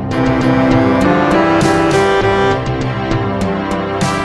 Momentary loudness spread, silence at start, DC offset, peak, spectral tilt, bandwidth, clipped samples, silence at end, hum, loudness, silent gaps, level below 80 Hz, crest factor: 6 LU; 0 s; under 0.1%; 0 dBFS; -6 dB/octave; 12.5 kHz; under 0.1%; 0 s; none; -13 LUFS; none; -32 dBFS; 12 dB